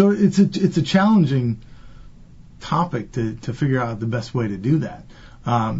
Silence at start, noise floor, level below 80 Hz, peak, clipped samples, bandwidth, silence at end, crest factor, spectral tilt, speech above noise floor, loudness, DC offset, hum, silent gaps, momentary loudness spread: 0 s; -43 dBFS; -46 dBFS; -2 dBFS; under 0.1%; 8 kHz; 0 s; 18 dB; -7.5 dB/octave; 24 dB; -20 LUFS; under 0.1%; none; none; 13 LU